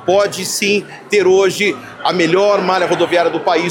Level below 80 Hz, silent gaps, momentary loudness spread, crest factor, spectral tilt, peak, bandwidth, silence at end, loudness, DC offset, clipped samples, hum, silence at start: -58 dBFS; none; 5 LU; 12 dB; -3.5 dB/octave; -2 dBFS; 17 kHz; 0 s; -14 LUFS; under 0.1%; under 0.1%; none; 0 s